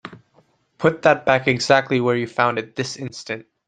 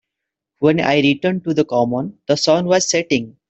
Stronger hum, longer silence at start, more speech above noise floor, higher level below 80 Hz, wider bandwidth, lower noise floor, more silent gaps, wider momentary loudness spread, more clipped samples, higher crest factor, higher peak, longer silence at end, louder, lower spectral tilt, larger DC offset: neither; second, 0.05 s vs 0.6 s; second, 40 dB vs 65 dB; about the same, -58 dBFS vs -58 dBFS; first, 9.6 kHz vs 8.2 kHz; second, -60 dBFS vs -82 dBFS; neither; first, 14 LU vs 6 LU; neither; about the same, 20 dB vs 18 dB; about the same, -2 dBFS vs 0 dBFS; about the same, 0.25 s vs 0.2 s; about the same, -19 LUFS vs -17 LUFS; about the same, -5 dB/octave vs -4.5 dB/octave; neither